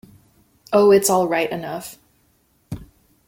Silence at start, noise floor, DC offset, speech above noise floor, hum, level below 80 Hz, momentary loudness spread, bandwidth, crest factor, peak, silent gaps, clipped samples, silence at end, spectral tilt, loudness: 0.7 s; -62 dBFS; under 0.1%; 45 dB; none; -54 dBFS; 22 LU; 16.5 kHz; 18 dB; -4 dBFS; none; under 0.1%; 0.45 s; -4 dB/octave; -18 LUFS